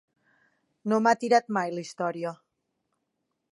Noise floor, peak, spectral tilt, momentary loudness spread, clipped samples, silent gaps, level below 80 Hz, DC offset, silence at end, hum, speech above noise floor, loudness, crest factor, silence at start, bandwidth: -80 dBFS; -8 dBFS; -5 dB/octave; 13 LU; under 0.1%; none; -82 dBFS; under 0.1%; 1.15 s; none; 54 dB; -27 LUFS; 22 dB; 0.85 s; 11.5 kHz